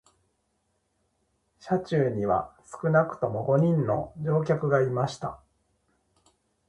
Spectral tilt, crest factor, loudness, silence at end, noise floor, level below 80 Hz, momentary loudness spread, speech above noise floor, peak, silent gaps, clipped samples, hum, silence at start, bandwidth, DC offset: -8 dB/octave; 20 dB; -26 LUFS; 1.35 s; -74 dBFS; -60 dBFS; 7 LU; 49 dB; -8 dBFS; none; under 0.1%; none; 1.65 s; 10 kHz; under 0.1%